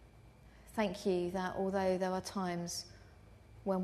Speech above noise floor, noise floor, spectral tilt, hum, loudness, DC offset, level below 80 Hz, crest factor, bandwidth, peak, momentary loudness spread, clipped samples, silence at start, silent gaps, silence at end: 23 dB; -59 dBFS; -5.5 dB/octave; none; -37 LUFS; under 0.1%; -62 dBFS; 16 dB; 13.5 kHz; -20 dBFS; 10 LU; under 0.1%; 0 s; none; 0 s